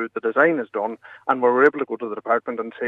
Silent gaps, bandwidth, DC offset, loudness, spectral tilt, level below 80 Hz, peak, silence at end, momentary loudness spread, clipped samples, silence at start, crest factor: none; 4.8 kHz; under 0.1%; -21 LUFS; -7.5 dB/octave; -80 dBFS; -4 dBFS; 0 s; 12 LU; under 0.1%; 0 s; 18 dB